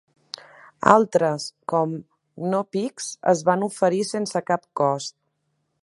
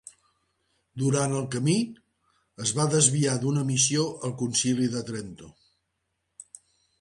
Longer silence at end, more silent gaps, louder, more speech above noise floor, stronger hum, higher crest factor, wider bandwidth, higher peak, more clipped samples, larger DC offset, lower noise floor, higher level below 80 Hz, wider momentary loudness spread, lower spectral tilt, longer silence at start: second, 0.7 s vs 1.5 s; neither; about the same, -23 LUFS vs -25 LUFS; about the same, 51 dB vs 53 dB; neither; about the same, 24 dB vs 20 dB; about the same, 11.5 kHz vs 11.5 kHz; first, 0 dBFS vs -8 dBFS; neither; neither; second, -73 dBFS vs -78 dBFS; about the same, -68 dBFS vs -64 dBFS; about the same, 18 LU vs 16 LU; about the same, -5 dB/octave vs -4 dB/octave; second, 0.8 s vs 0.95 s